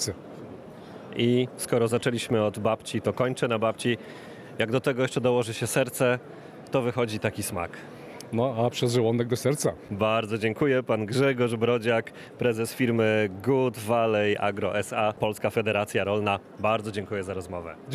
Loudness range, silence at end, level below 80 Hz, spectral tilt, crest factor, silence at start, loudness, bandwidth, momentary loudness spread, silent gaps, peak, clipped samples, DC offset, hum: 3 LU; 0 s; -62 dBFS; -5.5 dB/octave; 18 dB; 0 s; -26 LUFS; 14.5 kHz; 13 LU; none; -10 dBFS; under 0.1%; under 0.1%; none